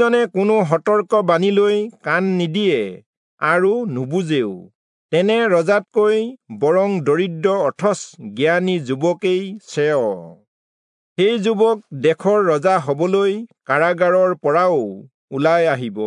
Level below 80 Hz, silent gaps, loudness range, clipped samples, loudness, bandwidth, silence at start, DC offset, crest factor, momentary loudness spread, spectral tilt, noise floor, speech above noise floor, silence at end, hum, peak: -74 dBFS; 3.06-3.37 s, 4.75-5.09 s, 10.48-11.16 s, 15.14-15.28 s; 3 LU; under 0.1%; -18 LUFS; 10.5 kHz; 0 s; under 0.1%; 16 dB; 7 LU; -6 dB/octave; under -90 dBFS; over 73 dB; 0 s; none; -2 dBFS